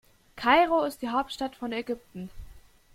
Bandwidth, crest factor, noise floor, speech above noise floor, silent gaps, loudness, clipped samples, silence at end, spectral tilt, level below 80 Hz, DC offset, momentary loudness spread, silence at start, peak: 16 kHz; 22 dB; -50 dBFS; 23 dB; none; -27 LUFS; under 0.1%; 0.35 s; -4.5 dB/octave; -52 dBFS; under 0.1%; 20 LU; 0.35 s; -8 dBFS